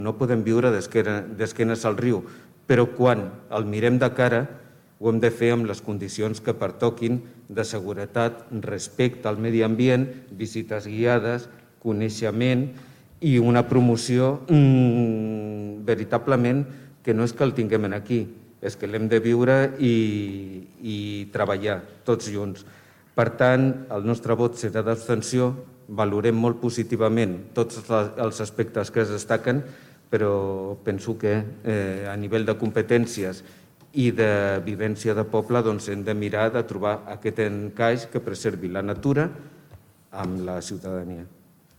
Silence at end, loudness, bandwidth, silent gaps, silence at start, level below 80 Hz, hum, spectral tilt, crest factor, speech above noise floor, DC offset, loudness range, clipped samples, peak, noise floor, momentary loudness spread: 0.5 s; -24 LUFS; 15.5 kHz; none; 0 s; -60 dBFS; none; -7 dB/octave; 18 dB; 28 dB; under 0.1%; 5 LU; under 0.1%; -6 dBFS; -51 dBFS; 12 LU